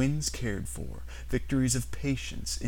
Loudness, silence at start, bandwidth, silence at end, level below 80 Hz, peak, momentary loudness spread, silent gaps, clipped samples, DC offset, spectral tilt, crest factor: -32 LUFS; 0 s; 17 kHz; 0 s; -40 dBFS; -14 dBFS; 12 LU; none; under 0.1%; 0.8%; -4.5 dB/octave; 16 dB